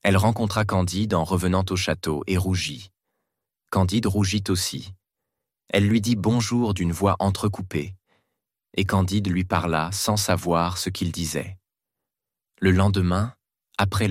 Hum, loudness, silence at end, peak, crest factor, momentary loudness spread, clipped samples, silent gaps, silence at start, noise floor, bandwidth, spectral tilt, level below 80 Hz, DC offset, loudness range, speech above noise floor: none; -23 LUFS; 0 s; -6 dBFS; 18 dB; 9 LU; under 0.1%; none; 0.05 s; -88 dBFS; 16 kHz; -5.5 dB/octave; -48 dBFS; under 0.1%; 2 LU; 65 dB